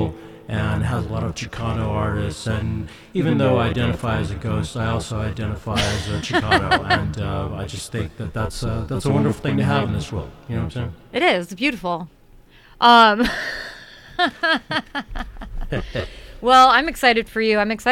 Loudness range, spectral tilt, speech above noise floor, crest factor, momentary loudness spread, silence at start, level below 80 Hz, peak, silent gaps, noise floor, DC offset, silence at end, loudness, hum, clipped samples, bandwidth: 5 LU; -5.5 dB/octave; 28 dB; 20 dB; 14 LU; 0 s; -36 dBFS; -2 dBFS; none; -48 dBFS; under 0.1%; 0 s; -20 LUFS; none; under 0.1%; 16 kHz